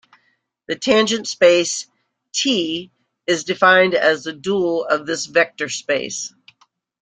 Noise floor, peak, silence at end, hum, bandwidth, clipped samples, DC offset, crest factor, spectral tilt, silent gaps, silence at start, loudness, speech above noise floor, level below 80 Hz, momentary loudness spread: -65 dBFS; -2 dBFS; 0.75 s; none; 9.6 kHz; under 0.1%; under 0.1%; 18 dB; -2.5 dB/octave; none; 0.7 s; -18 LUFS; 48 dB; -62 dBFS; 13 LU